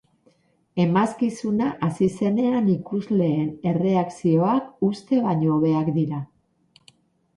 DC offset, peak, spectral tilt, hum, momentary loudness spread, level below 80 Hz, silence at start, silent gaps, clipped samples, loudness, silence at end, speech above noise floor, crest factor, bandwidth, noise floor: under 0.1%; -6 dBFS; -8.5 dB/octave; none; 5 LU; -60 dBFS; 0.75 s; none; under 0.1%; -22 LUFS; 1.1 s; 40 dB; 16 dB; 11.5 kHz; -62 dBFS